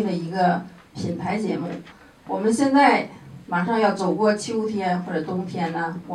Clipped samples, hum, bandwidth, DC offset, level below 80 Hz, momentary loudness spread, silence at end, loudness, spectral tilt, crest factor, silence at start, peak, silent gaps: under 0.1%; none; 12 kHz; under 0.1%; -62 dBFS; 14 LU; 0 s; -23 LUFS; -6 dB/octave; 20 dB; 0 s; -4 dBFS; none